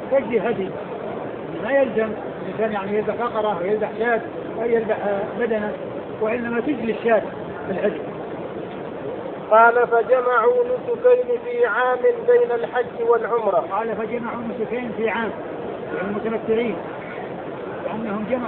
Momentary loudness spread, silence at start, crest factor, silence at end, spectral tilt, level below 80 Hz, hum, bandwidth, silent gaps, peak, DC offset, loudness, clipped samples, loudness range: 13 LU; 0 s; 18 dB; 0 s; -10.5 dB/octave; -58 dBFS; none; 4.2 kHz; none; -4 dBFS; under 0.1%; -22 LUFS; under 0.1%; 7 LU